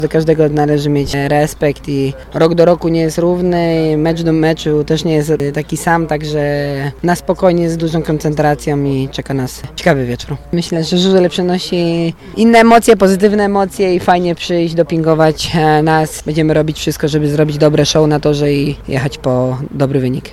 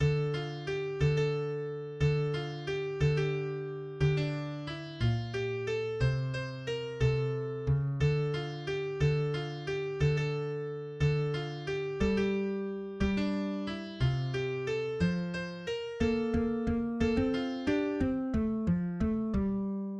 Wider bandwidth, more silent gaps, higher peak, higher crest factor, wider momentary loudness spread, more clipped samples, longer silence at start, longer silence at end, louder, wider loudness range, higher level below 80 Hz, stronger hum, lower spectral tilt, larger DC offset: first, 15 kHz vs 8.4 kHz; neither; first, 0 dBFS vs -16 dBFS; about the same, 12 dB vs 14 dB; about the same, 7 LU vs 7 LU; first, 0.4% vs under 0.1%; about the same, 0 s vs 0 s; about the same, 0 s vs 0 s; first, -13 LUFS vs -32 LUFS; about the same, 4 LU vs 2 LU; first, -36 dBFS vs -46 dBFS; neither; second, -6 dB/octave vs -7.5 dB/octave; neither